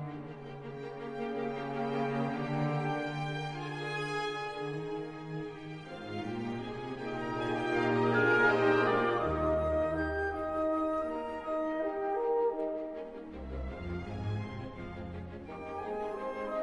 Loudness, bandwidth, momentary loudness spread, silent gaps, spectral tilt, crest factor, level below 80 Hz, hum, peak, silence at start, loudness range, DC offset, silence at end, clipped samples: -34 LUFS; 11 kHz; 15 LU; none; -7 dB/octave; 18 dB; -52 dBFS; none; -14 dBFS; 0 s; 10 LU; under 0.1%; 0 s; under 0.1%